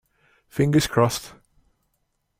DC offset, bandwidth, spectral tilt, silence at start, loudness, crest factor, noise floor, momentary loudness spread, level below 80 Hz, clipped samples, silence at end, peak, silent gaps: under 0.1%; 16 kHz; -5.5 dB/octave; 0.55 s; -22 LUFS; 20 dB; -73 dBFS; 15 LU; -50 dBFS; under 0.1%; 1.1 s; -6 dBFS; none